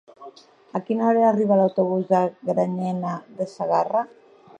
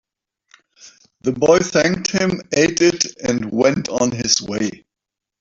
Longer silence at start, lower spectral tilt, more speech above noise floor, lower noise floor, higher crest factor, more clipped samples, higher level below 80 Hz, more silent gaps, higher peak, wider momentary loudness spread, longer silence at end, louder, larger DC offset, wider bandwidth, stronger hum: second, 0.2 s vs 0.85 s; first, -8.5 dB/octave vs -3.5 dB/octave; second, 24 dB vs 68 dB; second, -46 dBFS vs -85 dBFS; about the same, 16 dB vs 18 dB; neither; second, -76 dBFS vs -52 dBFS; neither; second, -6 dBFS vs -2 dBFS; first, 13 LU vs 9 LU; about the same, 0.55 s vs 0.65 s; second, -22 LUFS vs -17 LUFS; neither; first, 9 kHz vs 7.8 kHz; neither